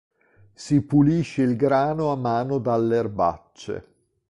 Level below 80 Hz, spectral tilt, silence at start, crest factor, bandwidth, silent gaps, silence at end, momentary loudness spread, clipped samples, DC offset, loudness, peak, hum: -52 dBFS; -8 dB/octave; 0.6 s; 16 dB; 11 kHz; none; 0.5 s; 15 LU; under 0.1%; under 0.1%; -22 LUFS; -8 dBFS; none